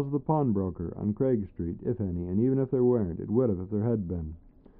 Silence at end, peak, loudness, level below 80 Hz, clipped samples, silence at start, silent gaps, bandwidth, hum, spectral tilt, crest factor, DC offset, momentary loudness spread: 0.3 s; -12 dBFS; -29 LUFS; -50 dBFS; under 0.1%; 0 s; none; 2.6 kHz; none; -13 dB/octave; 16 dB; under 0.1%; 8 LU